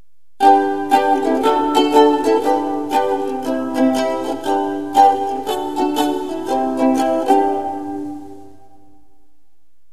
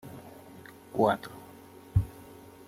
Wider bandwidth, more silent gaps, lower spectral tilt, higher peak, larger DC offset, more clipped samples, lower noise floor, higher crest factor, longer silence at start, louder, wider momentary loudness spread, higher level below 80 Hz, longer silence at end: second, 14 kHz vs 16 kHz; neither; second, -4 dB/octave vs -7.5 dB/octave; first, 0 dBFS vs -12 dBFS; first, 1% vs under 0.1%; neither; first, -67 dBFS vs -51 dBFS; about the same, 18 dB vs 22 dB; first, 0.4 s vs 0.05 s; first, -17 LUFS vs -30 LUFS; second, 9 LU vs 23 LU; second, -56 dBFS vs -48 dBFS; first, 1.45 s vs 0.55 s